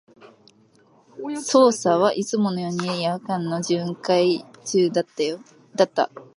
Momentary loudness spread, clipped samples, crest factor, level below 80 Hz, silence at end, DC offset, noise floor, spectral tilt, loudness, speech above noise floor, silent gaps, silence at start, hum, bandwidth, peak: 10 LU; under 0.1%; 20 dB; -74 dBFS; 0.15 s; under 0.1%; -57 dBFS; -5 dB/octave; -22 LUFS; 35 dB; none; 1.15 s; none; 11.5 kHz; -4 dBFS